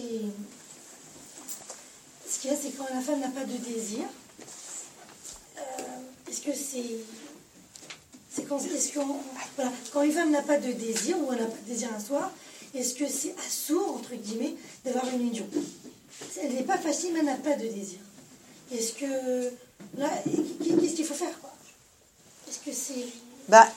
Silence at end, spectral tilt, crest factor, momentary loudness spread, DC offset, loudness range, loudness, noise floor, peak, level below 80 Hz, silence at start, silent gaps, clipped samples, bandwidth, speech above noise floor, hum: 0 s; -3 dB/octave; 28 dB; 19 LU; under 0.1%; 8 LU; -30 LUFS; -59 dBFS; -2 dBFS; -76 dBFS; 0 s; none; under 0.1%; 16.5 kHz; 31 dB; none